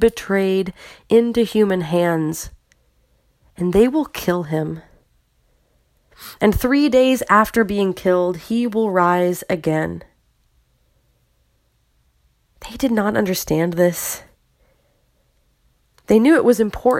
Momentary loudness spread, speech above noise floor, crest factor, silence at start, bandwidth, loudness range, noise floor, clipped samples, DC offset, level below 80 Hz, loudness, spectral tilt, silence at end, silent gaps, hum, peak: 13 LU; 46 dB; 20 dB; 0 s; 16.5 kHz; 8 LU; -63 dBFS; under 0.1%; under 0.1%; -44 dBFS; -18 LUFS; -5.5 dB/octave; 0 s; none; none; 0 dBFS